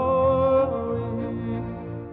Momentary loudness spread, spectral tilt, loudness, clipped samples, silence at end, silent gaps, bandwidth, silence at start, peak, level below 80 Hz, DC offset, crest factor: 12 LU; -11.5 dB/octave; -24 LUFS; under 0.1%; 0 s; none; 4 kHz; 0 s; -10 dBFS; -44 dBFS; under 0.1%; 14 dB